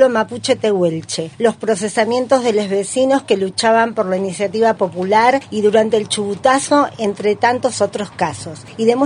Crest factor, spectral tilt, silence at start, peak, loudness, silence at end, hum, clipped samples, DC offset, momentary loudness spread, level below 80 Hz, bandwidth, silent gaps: 16 dB; -4 dB/octave; 0 s; 0 dBFS; -16 LUFS; 0 s; none; under 0.1%; under 0.1%; 7 LU; -60 dBFS; 11 kHz; none